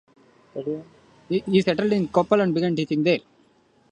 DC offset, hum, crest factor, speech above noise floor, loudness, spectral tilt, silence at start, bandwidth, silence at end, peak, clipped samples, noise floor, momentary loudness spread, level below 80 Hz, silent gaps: under 0.1%; none; 20 dB; 38 dB; -23 LUFS; -7 dB/octave; 0.55 s; 9.4 kHz; 0.75 s; -4 dBFS; under 0.1%; -60 dBFS; 12 LU; -60 dBFS; none